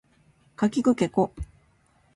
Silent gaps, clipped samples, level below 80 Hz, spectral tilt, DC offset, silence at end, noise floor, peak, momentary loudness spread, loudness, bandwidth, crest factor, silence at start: none; under 0.1%; -48 dBFS; -6.5 dB/octave; under 0.1%; 0.7 s; -63 dBFS; -8 dBFS; 18 LU; -25 LUFS; 11.5 kHz; 18 dB; 0.6 s